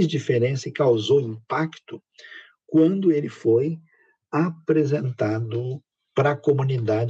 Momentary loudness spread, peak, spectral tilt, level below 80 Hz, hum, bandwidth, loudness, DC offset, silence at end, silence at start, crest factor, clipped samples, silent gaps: 18 LU; -8 dBFS; -7.5 dB/octave; -76 dBFS; none; 7.8 kHz; -23 LUFS; under 0.1%; 0 s; 0 s; 14 dB; under 0.1%; none